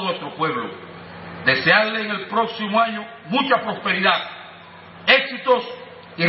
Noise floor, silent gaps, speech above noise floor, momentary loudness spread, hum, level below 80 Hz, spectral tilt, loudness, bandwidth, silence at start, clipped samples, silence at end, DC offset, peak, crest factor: -42 dBFS; none; 21 dB; 21 LU; none; -68 dBFS; -8.5 dB/octave; -19 LUFS; 5.8 kHz; 0 s; under 0.1%; 0 s; under 0.1%; 0 dBFS; 22 dB